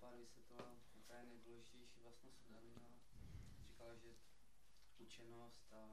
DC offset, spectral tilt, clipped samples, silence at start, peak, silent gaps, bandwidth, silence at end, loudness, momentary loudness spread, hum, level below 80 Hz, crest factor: under 0.1%; -4.5 dB/octave; under 0.1%; 0 s; -40 dBFS; none; 13 kHz; 0 s; -64 LUFS; 6 LU; none; -72 dBFS; 22 dB